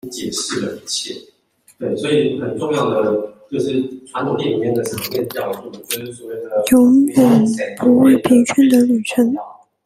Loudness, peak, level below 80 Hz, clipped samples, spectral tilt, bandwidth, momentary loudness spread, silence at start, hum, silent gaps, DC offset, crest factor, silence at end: -16 LUFS; 0 dBFS; -56 dBFS; under 0.1%; -5 dB/octave; 16 kHz; 14 LU; 0.05 s; none; none; under 0.1%; 16 dB; 0.35 s